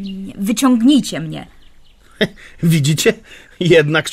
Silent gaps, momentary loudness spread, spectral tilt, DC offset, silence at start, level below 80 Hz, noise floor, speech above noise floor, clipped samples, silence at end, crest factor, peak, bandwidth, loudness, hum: none; 16 LU; -5 dB/octave; under 0.1%; 0 s; -46 dBFS; -44 dBFS; 29 dB; under 0.1%; 0 s; 14 dB; -2 dBFS; 16 kHz; -15 LUFS; none